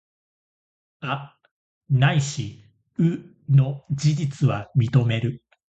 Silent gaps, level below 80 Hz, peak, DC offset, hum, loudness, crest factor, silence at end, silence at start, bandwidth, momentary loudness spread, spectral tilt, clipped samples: 1.51-1.81 s; -56 dBFS; -4 dBFS; under 0.1%; none; -23 LUFS; 18 dB; 0.4 s; 1 s; 8.2 kHz; 14 LU; -6.5 dB/octave; under 0.1%